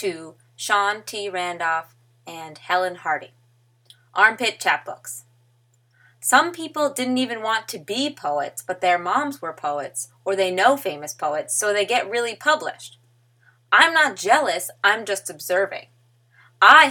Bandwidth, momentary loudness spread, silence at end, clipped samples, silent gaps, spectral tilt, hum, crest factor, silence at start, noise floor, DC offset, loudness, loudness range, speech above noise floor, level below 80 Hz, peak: 19.5 kHz; 14 LU; 0 s; under 0.1%; none; -1.5 dB/octave; none; 22 dB; 0 s; -61 dBFS; under 0.1%; -21 LUFS; 5 LU; 40 dB; -78 dBFS; 0 dBFS